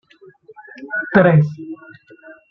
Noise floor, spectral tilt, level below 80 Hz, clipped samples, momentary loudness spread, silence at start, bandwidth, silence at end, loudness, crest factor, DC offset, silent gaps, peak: -46 dBFS; -10 dB/octave; -56 dBFS; under 0.1%; 24 LU; 0.8 s; 5.6 kHz; 0.2 s; -16 LUFS; 18 dB; under 0.1%; none; -2 dBFS